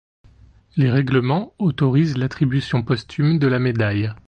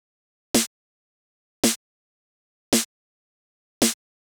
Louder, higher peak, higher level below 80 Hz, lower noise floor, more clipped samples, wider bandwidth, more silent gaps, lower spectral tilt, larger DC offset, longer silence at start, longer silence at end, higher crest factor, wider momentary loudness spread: first, -20 LUFS vs -24 LUFS; about the same, -4 dBFS vs -6 dBFS; first, -48 dBFS vs -58 dBFS; second, -50 dBFS vs under -90 dBFS; neither; second, 8.4 kHz vs over 20 kHz; second, none vs 0.67-1.63 s, 1.76-2.72 s, 2.85-3.81 s; first, -8.5 dB/octave vs -2 dB/octave; neither; first, 0.75 s vs 0.55 s; second, 0.1 s vs 0.4 s; second, 14 dB vs 22 dB; second, 5 LU vs 9 LU